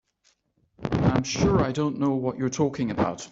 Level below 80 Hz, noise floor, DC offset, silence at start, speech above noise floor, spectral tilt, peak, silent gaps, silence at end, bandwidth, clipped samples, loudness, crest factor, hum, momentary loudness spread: -44 dBFS; -68 dBFS; under 0.1%; 0.8 s; 43 dB; -6 dB/octave; -6 dBFS; none; 0.05 s; 8 kHz; under 0.1%; -25 LUFS; 20 dB; none; 5 LU